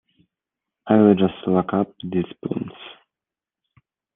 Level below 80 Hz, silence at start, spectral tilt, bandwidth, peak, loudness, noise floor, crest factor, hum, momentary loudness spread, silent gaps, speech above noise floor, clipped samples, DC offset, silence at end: -64 dBFS; 0.85 s; -11 dB/octave; 3.8 kHz; -2 dBFS; -20 LUFS; -89 dBFS; 20 dB; none; 23 LU; none; 70 dB; under 0.1%; under 0.1%; 1.25 s